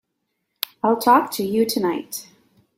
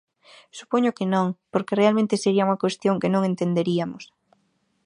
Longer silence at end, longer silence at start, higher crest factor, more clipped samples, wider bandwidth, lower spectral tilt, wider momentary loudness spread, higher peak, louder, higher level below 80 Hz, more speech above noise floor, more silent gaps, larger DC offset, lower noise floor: second, 0.55 s vs 0.8 s; first, 0.85 s vs 0.55 s; about the same, 22 dB vs 18 dB; neither; first, 16.5 kHz vs 10.5 kHz; second, -4 dB/octave vs -6.5 dB/octave; first, 15 LU vs 9 LU; first, 0 dBFS vs -6 dBFS; first, -20 LUFS vs -23 LUFS; about the same, -66 dBFS vs -70 dBFS; first, 57 dB vs 47 dB; neither; neither; first, -76 dBFS vs -69 dBFS